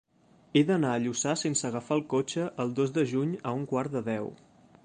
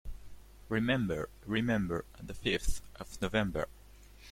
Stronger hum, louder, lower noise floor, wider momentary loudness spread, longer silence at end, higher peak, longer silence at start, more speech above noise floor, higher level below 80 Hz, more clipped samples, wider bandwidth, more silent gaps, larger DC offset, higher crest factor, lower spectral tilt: neither; first, -29 LUFS vs -34 LUFS; first, -62 dBFS vs -55 dBFS; second, 6 LU vs 16 LU; first, 0.5 s vs 0 s; first, -10 dBFS vs -14 dBFS; first, 0.55 s vs 0.05 s; first, 33 dB vs 22 dB; second, -70 dBFS vs -44 dBFS; neither; second, 10 kHz vs 16.5 kHz; neither; neither; about the same, 18 dB vs 20 dB; about the same, -5 dB/octave vs -5.5 dB/octave